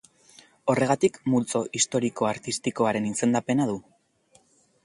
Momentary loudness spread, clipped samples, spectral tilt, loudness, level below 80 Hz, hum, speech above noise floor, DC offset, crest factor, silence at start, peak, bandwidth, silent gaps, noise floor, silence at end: 6 LU; under 0.1%; -4.5 dB/octave; -25 LUFS; -64 dBFS; none; 38 dB; under 0.1%; 20 dB; 0.65 s; -8 dBFS; 11.5 kHz; none; -62 dBFS; 1.05 s